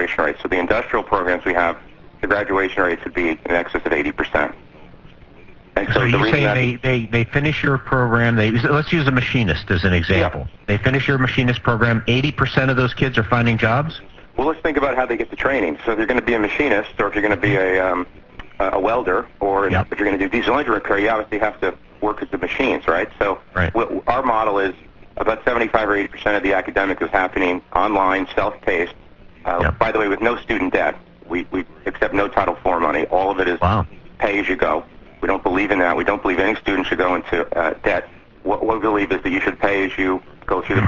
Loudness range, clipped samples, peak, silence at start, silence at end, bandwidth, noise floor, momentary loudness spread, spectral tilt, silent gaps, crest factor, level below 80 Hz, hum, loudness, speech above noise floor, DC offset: 3 LU; under 0.1%; 0 dBFS; 0 s; 0 s; 7.4 kHz; -43 dBFS; 7 LU; -7.5 dB/octave; none; 18 dB; -38 dBFS; none; -19 LUFS; 24 dB; under 0.1%